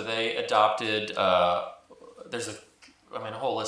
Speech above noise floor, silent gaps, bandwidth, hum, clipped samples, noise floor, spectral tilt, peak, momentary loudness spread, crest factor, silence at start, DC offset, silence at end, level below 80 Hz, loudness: 22 dB; none; 11 kHz; none; under 0.1%; -49 dBFS; -3.5 dB/octave; -6 dBFS; 16 LU; 22 dB; 0 s; under 0.1%; 0 s; -70 dBFS; -26 LUFS